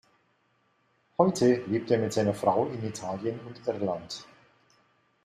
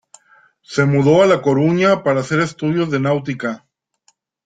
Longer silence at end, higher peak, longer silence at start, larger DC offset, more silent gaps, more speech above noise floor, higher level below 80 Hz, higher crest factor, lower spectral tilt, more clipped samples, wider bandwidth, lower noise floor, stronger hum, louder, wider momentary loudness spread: about the same, 1 s vs 0.9 s; second, -8 dBFS vs -2 dBFS; first, 1.2 s vs 0.7 s; neither; neither; about the same, 43 dB vs 46 dB; second, -68 dBFS vs -56 dBFS; first, 22 dB vs 16 dB; about the same, -6 dB/octave vs -7 dB/octave; neither; first, 13.5 kHz vs 9.2 kHz; first, -70 dBFS vs -61 dBFS; neither; second, -28 LUFS vs -16 LUFS; about the same, 12 LU vs 12 LU